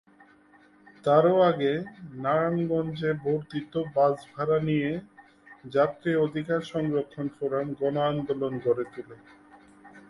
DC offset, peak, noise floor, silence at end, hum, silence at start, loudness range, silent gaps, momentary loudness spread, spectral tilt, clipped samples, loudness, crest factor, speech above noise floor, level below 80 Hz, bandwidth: under 0.1%; -8 dBFS; -58 dBFS; 0.1 s; none; 1.05 s; 4 LU; none; 11 LU; -8 dB/octave; under 0.1%; -27 LUFS; 20 dB; 31 dB; -64 dBFS; 11 kHz